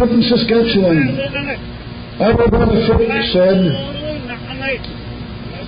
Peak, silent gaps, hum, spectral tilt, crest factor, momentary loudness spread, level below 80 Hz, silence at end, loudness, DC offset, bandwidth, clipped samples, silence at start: -2 dBFS; none; none; -11.5 dB/octave; 12 dB; 16 LU; -30 dBFS; 0 s; -15 LUFS; under 0.1%; 5.2 kHz; under 0.1%; 0 s